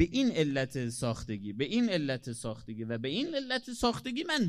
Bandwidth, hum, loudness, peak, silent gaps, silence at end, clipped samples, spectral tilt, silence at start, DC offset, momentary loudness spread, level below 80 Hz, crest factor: 14 kHz; none; -33 LUFS; -12 dBFS; none; 0 s; under 0.1%; -5 dB/octave; 0 s; under 0.1%; 10 LU; -56 dBFS; 20 dB